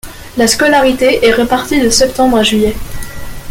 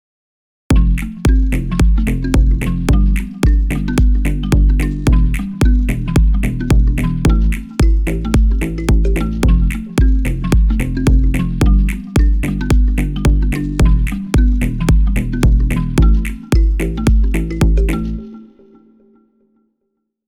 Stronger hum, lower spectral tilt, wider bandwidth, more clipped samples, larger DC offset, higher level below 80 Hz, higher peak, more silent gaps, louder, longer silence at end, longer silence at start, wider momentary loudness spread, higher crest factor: neither; second, -3 dB/octave vs -7 dB/octave; first, 17 kHz vs 13 kHz; neither; neither; second, -30 dBFS vs -14 dBFS; about the same, 0 dBFS vs -2 dBFS; neither; first, -10 LUFS vs -16 LUFS; second, 0 s vs 1.85 s; second, 0.05 s vs 0.7 s; first, 17 LU vs 3 LU; about the same, 12 dB vs 10 dB